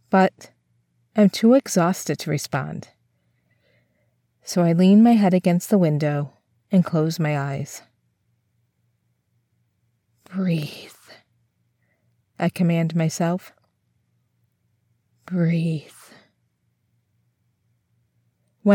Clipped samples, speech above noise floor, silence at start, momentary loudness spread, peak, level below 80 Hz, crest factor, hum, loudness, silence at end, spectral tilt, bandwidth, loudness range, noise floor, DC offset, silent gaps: under 0.1%; 50 dB; 0.1 s; 18 LU; -4 dBFS; -72 dBFS; 18 dB; none; -21 LUFS; 0 s; -6.5 dB/octave; 17 kHz; 13 LU; -70 dBFS; under 0.1%; none